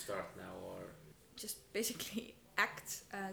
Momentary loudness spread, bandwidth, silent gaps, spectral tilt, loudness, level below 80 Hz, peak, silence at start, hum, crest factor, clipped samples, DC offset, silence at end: 15 LU; over 20 kHz; none; -2 dB/octave; -42 LUFS; -72 dBFS; -18 dBFS; 0 s; none; 26 dB; under 0.1%; under 0.1%; 0 s